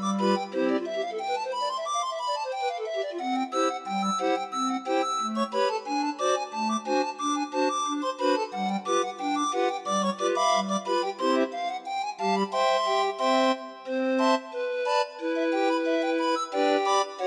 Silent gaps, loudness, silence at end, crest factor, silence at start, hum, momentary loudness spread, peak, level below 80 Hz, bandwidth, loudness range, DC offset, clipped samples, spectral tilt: none; -27 LUFS; 0 s; 16 dB; 0 s; none; 6 LU; -12 dBFS; -84 dBFS; 11.5 kHz; 3 LU; under 0.1%; under 0.1%; -4 dB/octave